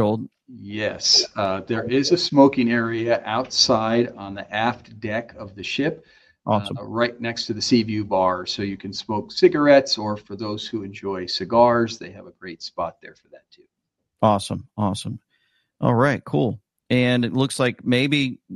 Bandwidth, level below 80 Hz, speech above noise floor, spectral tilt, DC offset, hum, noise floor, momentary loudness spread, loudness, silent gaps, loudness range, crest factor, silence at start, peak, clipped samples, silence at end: 12 kHz; -58 dBFS; 57 dB; -4.5 dB/octave; under 0.1%; none; -78 dBFS; 17 LU; -21 LUFS; none; 6 LU; 20 dB; 0 s; -2 dBFS; under 0.1%; 0 s